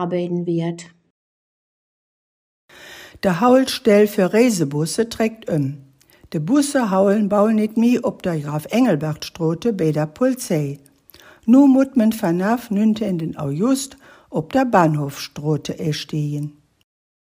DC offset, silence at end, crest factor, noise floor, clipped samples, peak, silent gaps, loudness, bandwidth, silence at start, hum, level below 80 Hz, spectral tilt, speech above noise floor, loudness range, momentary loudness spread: under 0.1%; 0.85 s; 18 dB; -48 dBFS; under 0.1%; -2 dBFS; 1.10-2.69 s; -19 LUFS; 16 kHz; 0 s; none; -58 dBFS; -6 dB/octave; 30 dB; 4 LU; 13 LU